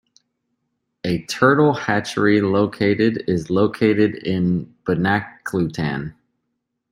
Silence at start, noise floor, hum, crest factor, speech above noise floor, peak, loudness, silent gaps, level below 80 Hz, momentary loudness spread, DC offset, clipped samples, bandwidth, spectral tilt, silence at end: 1.05 s; -76 dBFS; none; 18 dB; 57 dB; -2 dBFS; -19 LUFS; none; -54 dBFS; 8 LU; under 0.1%; under 0.1%; 16 kHz; -6.5 dB/octave; 0.8 s